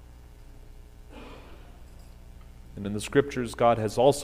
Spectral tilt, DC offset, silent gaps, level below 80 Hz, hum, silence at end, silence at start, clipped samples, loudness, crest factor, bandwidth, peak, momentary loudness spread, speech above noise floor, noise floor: -5.5 dB/octave; under 0.1%; none; -48 dBFS; 60 Hz at -50 dBFS; 0 s; 0 s; under 0.1%; -26 LUFS; 22 dB; 15.5 kHz; -8 dBFS; 25 LU; 23 dB; -48 dBFS